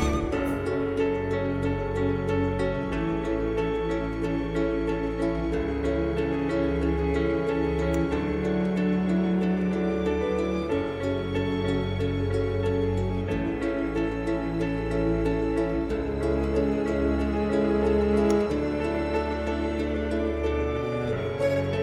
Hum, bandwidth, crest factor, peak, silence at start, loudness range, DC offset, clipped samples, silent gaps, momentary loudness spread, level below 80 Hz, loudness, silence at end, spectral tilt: none; 12.5 kHz; 16 dB; -10 dBFS; 0 s; 2 LU; under 0.1%; under 0.1%; none; 4 LU; -36 dBFS; -27 LUFS; 0 s; -7.5 dB/octave